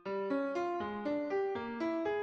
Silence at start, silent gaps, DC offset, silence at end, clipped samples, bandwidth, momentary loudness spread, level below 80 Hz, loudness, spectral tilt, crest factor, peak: 0.05 s; none; under 0.1%; 0 s; under 0.1%; 7.6 kHz; 3 LU; -72 dBFS; -36 LUFS; -6.5 dB/octave; 12 dB; -24 dBFS